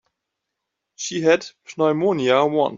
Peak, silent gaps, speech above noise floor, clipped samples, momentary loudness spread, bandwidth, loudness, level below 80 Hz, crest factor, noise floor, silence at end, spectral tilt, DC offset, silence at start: -4 dBFS; none; 61 dB; under 0.1%; 11 LU; 7.6 kHz; -20 LUFS; -68 dBFS; 18 dB; -81 dBFS; 0 s; -4.5 dB/octave; under 0.1%; 1 s